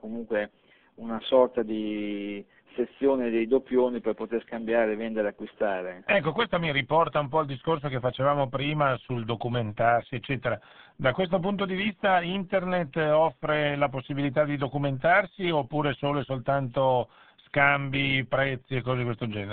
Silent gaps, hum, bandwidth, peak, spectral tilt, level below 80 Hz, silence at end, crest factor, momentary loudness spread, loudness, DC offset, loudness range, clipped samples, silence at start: none; none; 4.5 kHz; -6 dBFS; -4.5 dB/octave; -58 dBFS; 0 s; 20 dB; 9 LU; -27 LUFS; 0.2%; 2 LU; under 0.1%; 0.05 s